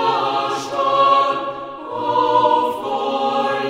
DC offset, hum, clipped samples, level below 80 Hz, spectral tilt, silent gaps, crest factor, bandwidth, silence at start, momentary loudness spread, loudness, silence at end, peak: under 0.1%; none; under 0.1%; -62 dBFS; -4 dB/octave; none; 16 dB; 15.5 kHz; 0 s; 10 LU; -18 LUFS; 0 s; -4 dBFS